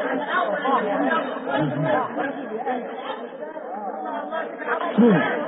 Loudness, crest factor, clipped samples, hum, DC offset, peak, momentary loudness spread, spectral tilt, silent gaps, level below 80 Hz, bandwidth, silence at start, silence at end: -24 LUFS; 18 dB; under 0.1%; none; under 0.1%; -6 dBFS; 14 LU; -11 dB/octave; none; -72 dBFS; 4 kHz; 0 s; 0 s